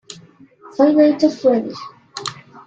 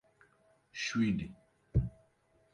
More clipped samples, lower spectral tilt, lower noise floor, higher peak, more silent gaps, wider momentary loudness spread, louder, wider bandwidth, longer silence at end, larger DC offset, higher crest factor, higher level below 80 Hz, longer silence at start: neither; about the same, -5 dB/octave vs -5.5 dB/octave; second, -46 dBFS vs -71 dBFS; first, -2 dBFS vs -18 dBFS; neither; first, 20 LU vs 14 LU; first, -15 LUFS vs -35 LUFS; second, 9.2 kHz vs 10.5 kHz; second, 0.35 s vs 0.65 s; neither; about the same, 16 dB vs 20 dB; second, -64 dBFS vs -48 dBFS; second, 0.1 s vs 0.75 s